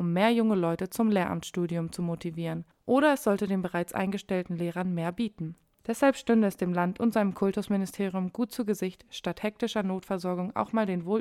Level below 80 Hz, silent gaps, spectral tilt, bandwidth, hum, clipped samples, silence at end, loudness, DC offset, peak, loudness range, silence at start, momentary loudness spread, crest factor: -64 dBFS; none; -6.5 dB/octave; 15 kHz; none; under 0.1%; 0 s; -29 LUFS; under 0.1%; -10 dBFS; 3 LU; 0 s; 9 LU; 18 dB